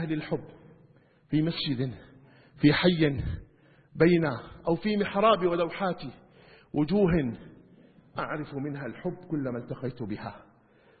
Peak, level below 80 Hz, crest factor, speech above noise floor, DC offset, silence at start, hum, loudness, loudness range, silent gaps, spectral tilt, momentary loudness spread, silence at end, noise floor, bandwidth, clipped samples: -8 dBFS; -50 dBFS; 20 dB; 33 dB; under 0.1%; 0 s; none; -28 LUFS; 9 LU; none; -11 dB/octave; 15 LU; 0.6 s; -60 dBFS; 4.8 kHz; under 0.1%